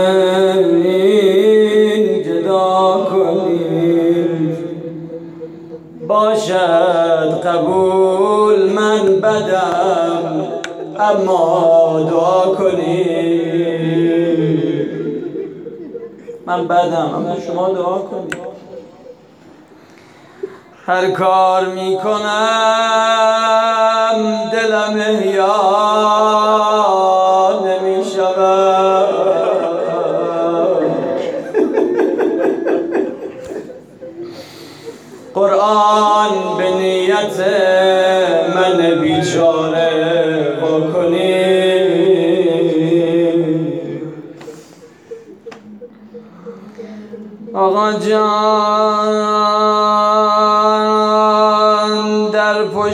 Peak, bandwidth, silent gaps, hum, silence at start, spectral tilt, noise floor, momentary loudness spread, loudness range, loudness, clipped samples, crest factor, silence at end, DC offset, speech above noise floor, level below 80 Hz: -2 dBFS; 12.5 kHz; none; none; 0 s; -5.5 dB/octave; -42 dBFS; 18 LU; 7 LU; -14 LUFS; under 0.1%; 12 dB; 0 s; under 0.1%; 29 dB; -64 dBFS